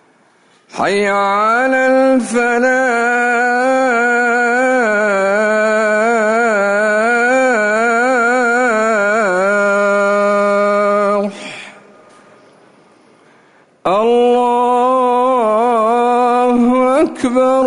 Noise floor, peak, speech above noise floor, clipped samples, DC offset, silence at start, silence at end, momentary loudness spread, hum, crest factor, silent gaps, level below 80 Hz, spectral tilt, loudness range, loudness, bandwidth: -51 dBFS; -4 dBFS; 39 dB; under 0.1%; under 0.1%; 0.75 s; 0 s; 2 LU; none; 10 dB; none; -56 dBFS; -4.5 dB/octave; 5 LU; -13 LUFS; 11 kHz